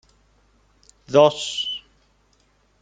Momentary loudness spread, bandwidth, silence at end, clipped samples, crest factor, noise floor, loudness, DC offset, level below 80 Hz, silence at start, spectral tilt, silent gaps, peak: 12 LU; 9.4 kHz; 1.05 s; under 0.1%; 22 dB; -62 dBFS; -20 LUFS; under 0.1%; -62 dBFS; 1.1 s; -4 dB/octave; none; -2 dBFS